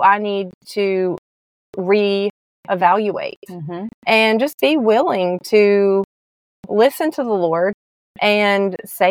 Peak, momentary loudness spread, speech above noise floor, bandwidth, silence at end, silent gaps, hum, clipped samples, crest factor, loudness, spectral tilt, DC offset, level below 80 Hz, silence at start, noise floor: 0 dBFS; 15 LU; over 73 dB; 17.5 kHz; 0 s; 0.54-0.61 s, 1.18-1.73 s, 2.30-2.63 s, 3.36-3.42 s, 3.94-4.02 s, 4.54-4.58 s, 6.04-6.63 s, 7.74-8.14 s; none; under 0.1%; 16 dB; -17 LUFS; -5.5 dB/octave; under 0.1%; -68 dBFS; 0 s; under -90 dBFS